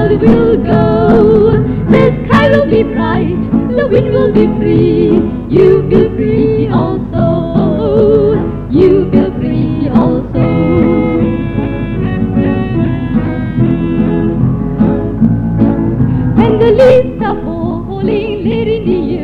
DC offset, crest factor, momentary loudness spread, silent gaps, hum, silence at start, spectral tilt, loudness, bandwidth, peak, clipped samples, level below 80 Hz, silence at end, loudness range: under 0.1%; 10 dB; 7 LU; none; none; 0 s; -10 dB/octave; -11 LUFS; 6 kHz; 0 dBFS; 0.4%; -26 dBFS; 0 s; 3 LU